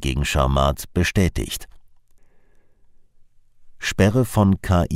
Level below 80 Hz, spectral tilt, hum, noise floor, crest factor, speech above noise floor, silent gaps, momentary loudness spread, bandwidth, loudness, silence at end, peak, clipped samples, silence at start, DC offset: -32 dBFS; -5.5 dB/octave; none; -51 dBFS; 18 dB; 32 dB; none; 10 LU; 16 kHz; -20 LUFS; 0 s; -4 dBFS; under 0.1%; 0 s; under 0.1%